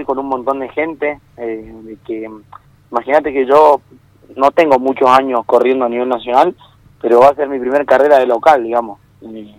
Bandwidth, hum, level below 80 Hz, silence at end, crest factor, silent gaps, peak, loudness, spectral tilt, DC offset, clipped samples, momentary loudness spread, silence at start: 15.5 kHz; none; -52 dBFS; 0.1 s; 14 dB; none; 0 dBFS; -13 LUFS; -5.5 dB/octave; under 0.1%; 0.8%; 17 LU; 0 s